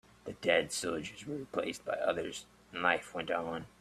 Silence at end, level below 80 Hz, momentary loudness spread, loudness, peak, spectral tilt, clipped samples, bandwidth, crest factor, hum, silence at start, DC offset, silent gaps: 0.15 s; -68 dBFS; 12 LU; -35 LUFS; -12 dBFS; -3 dB/octave; under 0.1%; 15 kHz; 24 dB; none; 0.25 s; under 0.1%; none